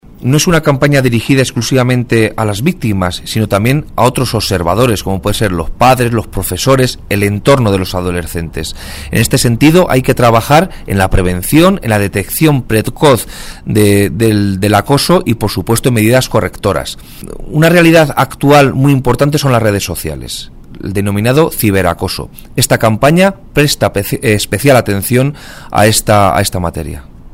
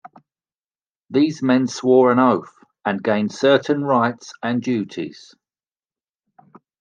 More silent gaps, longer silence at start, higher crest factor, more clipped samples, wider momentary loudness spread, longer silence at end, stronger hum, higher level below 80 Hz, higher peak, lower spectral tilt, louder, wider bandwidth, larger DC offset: second, none vs 0.96-1.01 s; about the same, 0.1 s vs 0.05 s; second, 10 dB vs 18 dB; first, 0.3% vs under 0.1%; second, 10 LU vs 13 LU; second, 0 s vs 1.7 s; neither; first, -28 dBFS vs -72 dBFS; about the same, 0 dBFS vs -2 dBFS; about the same, -5.5 dB/octave vs -6 dB/octave; first, -11 LUFS vs -19 LUFS; first, 16.5 kHz vs 8.8 kHz; neither